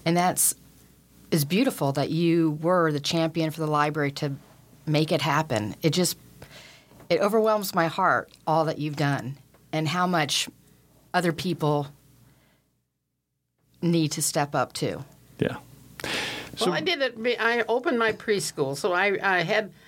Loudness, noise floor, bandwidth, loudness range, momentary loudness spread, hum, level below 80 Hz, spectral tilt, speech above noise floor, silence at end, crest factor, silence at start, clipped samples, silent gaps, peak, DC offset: -25 LUFS; -79 dBFS; 17 kHz; 5 LU; 9 LU; none; -64 dBFS; -4.5 dB/octave; 54 dB; 0.2 s; 18 dB; 0.05 s; under 0.1%; none; -8 dBFS; under 0.1%